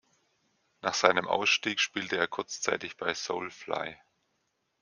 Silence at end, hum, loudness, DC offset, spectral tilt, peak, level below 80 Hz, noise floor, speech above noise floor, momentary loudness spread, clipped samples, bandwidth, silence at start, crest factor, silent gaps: 0.85 s; none; -29 LUFS; under 0.1%; -2 dB/octave; -4 dBFS; -76 dBFS; -78 dBFS; 47 dB; 10 LU; under 0.1%; 10.5 kHz; 0.85 s; 28 dB; none